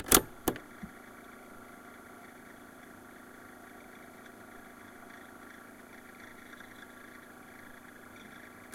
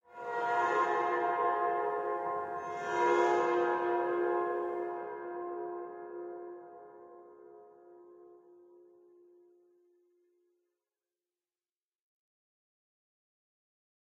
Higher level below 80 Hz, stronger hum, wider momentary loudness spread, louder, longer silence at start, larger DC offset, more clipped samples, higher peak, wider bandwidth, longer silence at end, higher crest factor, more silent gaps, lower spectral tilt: first, -58 dBFS vs -86 dBFS; neither; second, 13 LU vs 19 LU; second, -36 LUFS vs -33 LUFS; about the same, 0 s vs 0.1 s; neither; neither; first, -4 dBFS vs -16 dBFS; first, 16 kHz vs 7.8 kHz; second, 0 s vs 5.65 s; first, 36 dB vs 20 dB; neither; second, -2 dB/octave vs -5 dB/octave